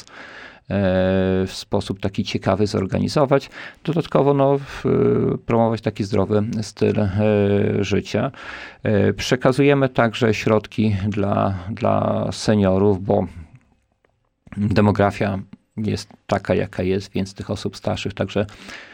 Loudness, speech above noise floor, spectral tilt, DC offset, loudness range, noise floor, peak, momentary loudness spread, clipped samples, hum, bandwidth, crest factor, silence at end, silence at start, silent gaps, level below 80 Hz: -20 LUFS; 46 dB; -7 dB/octave; under 0.1%; 4 LU; -65 dBFS; -4 dBFS; 10 LU; under 0.1%; none; 15.5 kHz; 16 dB; 0 s; 0.15 s; none; -48 dBFS